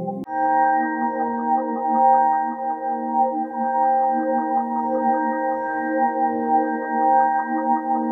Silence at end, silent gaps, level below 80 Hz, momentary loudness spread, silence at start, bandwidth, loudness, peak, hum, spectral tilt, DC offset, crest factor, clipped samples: 0 s; none; -76 dBFS; 6 LU; 0 s; 2.1 kHz; -21 LUFS; -6 dBFS; none; -10 dB/octave; under 0.1%; 14 dB; under 0.1%